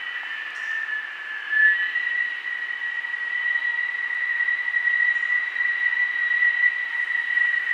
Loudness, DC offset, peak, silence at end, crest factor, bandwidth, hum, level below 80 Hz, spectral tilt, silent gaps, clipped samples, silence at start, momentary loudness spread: -22 LUFS; under 0.1%; -8 dBFS; 0 s; 16 dB; 9 kHz; none; under -90 dBFS; 1.5 dB/octave; none; under 0.1%; 0 s; 10 LU